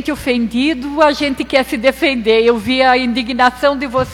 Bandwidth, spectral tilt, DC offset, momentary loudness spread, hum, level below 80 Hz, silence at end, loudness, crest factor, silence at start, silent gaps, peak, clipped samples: 16.5 kHz; -4.5 dB/octave; under 0.1%; 5 LU; none; -40 dBFS; 0 s; -14 LUFS; 14 dB; 0 s; none; 0 dBFS; under 0.1%